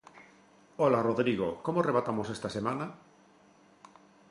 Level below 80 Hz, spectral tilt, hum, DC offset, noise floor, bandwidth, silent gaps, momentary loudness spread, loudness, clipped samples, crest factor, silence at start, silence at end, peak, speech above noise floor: -66 dBFS; -7 dB/octave; none; under 0.1%; -61 dBFS; 11.5 kHz; none; 10 LU; -30 LUFS; under 0.1%; 20 dB; 0.15 s; 1.35 s; -12 dBFS; 31 dB